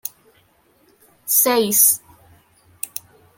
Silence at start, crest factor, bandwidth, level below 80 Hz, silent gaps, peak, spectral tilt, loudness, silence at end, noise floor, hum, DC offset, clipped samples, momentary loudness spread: 0.05 s; 22 dB; 17 kHz; -66 dBFS; none; 0 dBFS; -1.5 dB/octave; -15 LUFS; 0.5 s; -58 dBFS; none; under 0.1%; under 0.1%; 20 LU